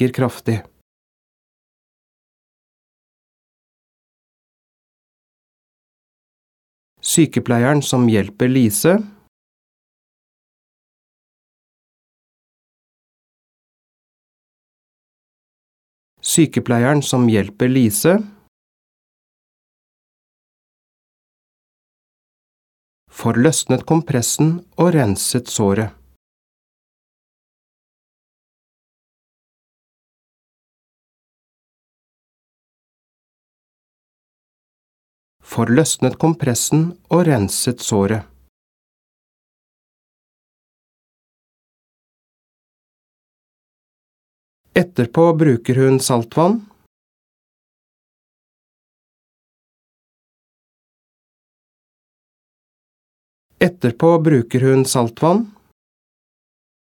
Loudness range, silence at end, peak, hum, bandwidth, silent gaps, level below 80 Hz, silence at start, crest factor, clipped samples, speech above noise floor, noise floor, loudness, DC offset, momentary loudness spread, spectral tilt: 9 LU; 1.45 s; 0 dBFS; none; 18 kHz; 0.81-6.96 s, 9.28-16.17 s, 18.48-23.07 s, 26.16-35.40 s, 38.49-44.64 s, 46.86-53.49 s; -58 dBFS; 0 s; 20 dB; under 0.1%; over 75 dB; under -90 dBFS; -16 LUFS; under 0.1%; 6 LU; -5.5 dB/octave